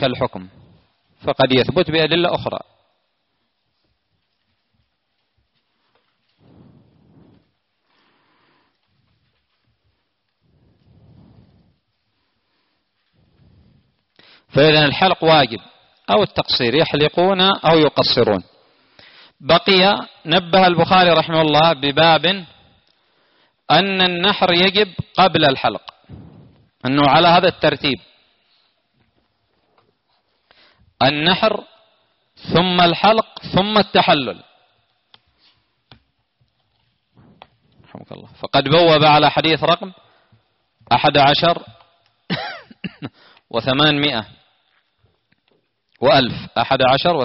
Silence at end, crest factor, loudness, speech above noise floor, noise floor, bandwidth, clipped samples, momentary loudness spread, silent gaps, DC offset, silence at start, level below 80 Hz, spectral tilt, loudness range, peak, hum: 0 s; 18 dB; -15 LUFS; 56 dB; -71 dBFS; 6 kHz; under 0.1%; 15 LU; none; under 0.1%; 0 s; -52 dBFS; -2.5 dB/octave; 7 LU; -2 dBFS; none